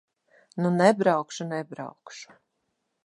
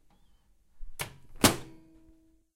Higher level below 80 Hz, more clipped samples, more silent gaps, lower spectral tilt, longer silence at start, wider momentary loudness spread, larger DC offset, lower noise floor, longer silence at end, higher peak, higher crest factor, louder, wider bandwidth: second, -76 dBFS vs -50 dBFS; neither; neither; first, -6 dB/octave vs -3 dB/octave; second, 0.55 s vs 0.75 s; first, 23 LU vs 16 LU; neither; first, -78 dBFS vs -63 dBFS; about the same, 0.8 s vs 0.8 s; first, -4 dBFS vs -8 dBFS; about the same, 22 dB vs 26 dB; first, -24 LUFS vs -29 LUFS; second, 11.5 kHz vs 16 kHz